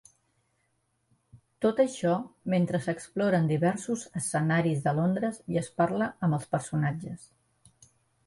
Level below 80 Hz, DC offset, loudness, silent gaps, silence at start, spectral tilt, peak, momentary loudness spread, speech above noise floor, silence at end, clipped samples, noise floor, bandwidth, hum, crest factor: -64 dBFS; under 0.1%; -28 LUFS; none; 1.35 s; -6.5 dB/octave; -12 dBFS; 7 LU; 47 dB; 1 s; under 0.1%; -74 dBFS; 11.5 kHz; none; 18 dB